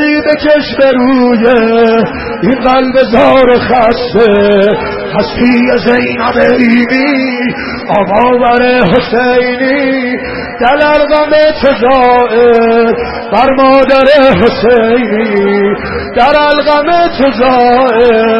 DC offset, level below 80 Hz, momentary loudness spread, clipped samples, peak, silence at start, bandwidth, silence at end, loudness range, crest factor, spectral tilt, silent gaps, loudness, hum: under 0.1%; -32 dBFS; 7 LU; 0.4%; 0 dBFS; 0 s; 6 kHz; 0 s; 2 LU; 8 dB; -7.5 dB/octave; none; -8 LUFS; none